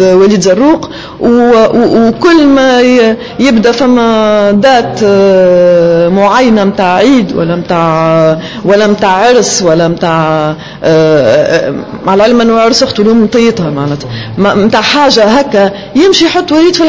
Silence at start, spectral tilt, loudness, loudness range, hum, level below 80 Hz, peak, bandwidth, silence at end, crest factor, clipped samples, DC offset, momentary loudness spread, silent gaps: 0 s; -5 dB/octave; -7 LUFS; 2 LU; none; -38 dBFS; 0 dBFS; 8 kHz; 0 s; 6 dB; 1%; under 0.1%; 6 LU; none